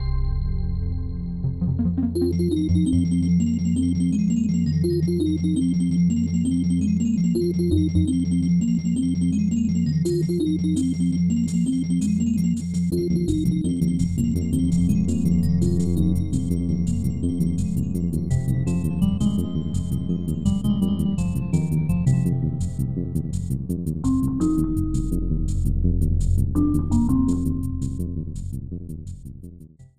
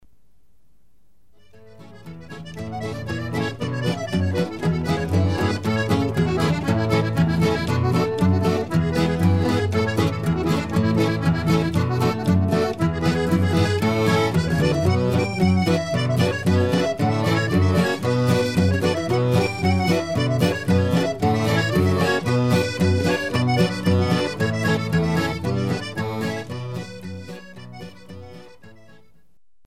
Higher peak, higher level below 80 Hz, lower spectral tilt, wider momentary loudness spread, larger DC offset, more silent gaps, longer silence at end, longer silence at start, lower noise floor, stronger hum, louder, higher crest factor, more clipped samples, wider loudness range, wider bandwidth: about the same, -8 dBFS vs -6 dBFS; first, -32 dBFS vs -44 dBFS; first, -8 dB/octave vs -6.5 dB/octave; second, 6 LU vs 10 LU; second, under 0.1% vs 0.5%; neither; second, 0 s vs 0.95 s; second, 0 s vs 1.8 s; second, -44 dBFS vs -65 dBFS; neither; about the same, -23 LUFS vs -21 LUFS; about the same, 14 dB vs 16 dB; neither; second, 3 LU vs 8 LU; second, 14 kHz vs 15.5 kHz